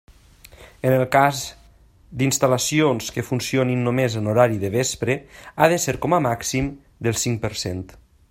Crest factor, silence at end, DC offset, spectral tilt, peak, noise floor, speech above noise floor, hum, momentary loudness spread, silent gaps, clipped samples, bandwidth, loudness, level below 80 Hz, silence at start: 20 dB; 0.45 s; under 0.1%; -4.5 dB/octave; 0 dBFS; -52 dBFS; 31 dB; none; 11 LU; none; under 0.1%; 16.5 kHz; -21 LUFS; -48 dBFS; 0.6 s